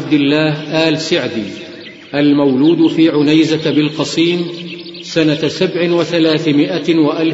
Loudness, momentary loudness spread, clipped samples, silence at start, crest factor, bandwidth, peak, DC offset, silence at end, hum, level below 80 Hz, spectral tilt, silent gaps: -13 LUFS; 12 LU; under 0.1%; 0 s; 14 dB; 8 kHz; 0 dBFS; under 0.1%; 0 s; none; -58 dBFS; -6 dB/octave; none